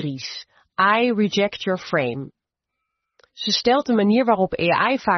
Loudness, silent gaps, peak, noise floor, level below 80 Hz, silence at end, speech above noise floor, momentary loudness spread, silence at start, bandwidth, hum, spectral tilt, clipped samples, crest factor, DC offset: -20 LUFS; none; -4 dBFS; -81 dBFS; -58 dBFS; 0 s; 61 dB; 15 LU; 0 s; 6.4 kHz; none; -5 dB/octave; under 0.1%; 16 dB; under 0.1%